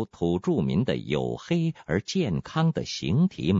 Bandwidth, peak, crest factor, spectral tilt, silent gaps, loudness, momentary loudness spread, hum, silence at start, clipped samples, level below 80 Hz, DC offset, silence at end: 7.6 kHz; -10 dBFS; 16 dB; -6.5 dB/octave; none; -27 LUFS; 4 LU; none; 0 s; under 0.1%; -52 dBFS; under 0.1%; 0 s